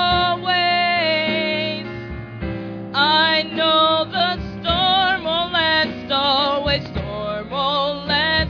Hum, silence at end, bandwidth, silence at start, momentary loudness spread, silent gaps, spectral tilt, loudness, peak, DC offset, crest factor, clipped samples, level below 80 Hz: none; 0 s; 5.4 kHz; 0 s; 12 LU; none; -6 dB/octave; -18 LUFS; -4 dBFS; under 0.1%; 16 dB; under 0.1%; -40 dBFS